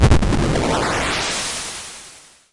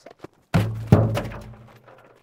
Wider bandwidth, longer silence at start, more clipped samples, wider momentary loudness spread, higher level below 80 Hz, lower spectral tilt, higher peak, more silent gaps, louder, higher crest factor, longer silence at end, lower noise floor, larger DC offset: second, 11.5 kHz vs 16 kHz; about the same, 0 s vs 0.05 s; neither; second, 16 LU vs 20 LU; first, -26 dBFS vs -42 dBFS; second, -4.5 dB/octave vs -8 dB/octave; second, -6 dBFS vs 0 dBFS; neither; first, -19 LUFS vs -22 LUFS; second, 12 dB vs 24 dB; second, 0.35 s vs 0.7 s; second, -44 dBFS vs -50 dBFS; neither